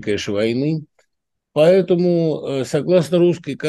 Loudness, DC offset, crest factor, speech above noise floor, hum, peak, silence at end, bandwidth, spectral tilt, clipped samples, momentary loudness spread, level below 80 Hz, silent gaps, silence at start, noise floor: -18 LUFS; under 0.1%; 16 dB; 60 dB; none; -2 dBFS; 0 s; 12.5 kHz; -7 dB/octave; under 0.1%; 9 LU; -60 dBFS; none; 0 s; -77 dBFS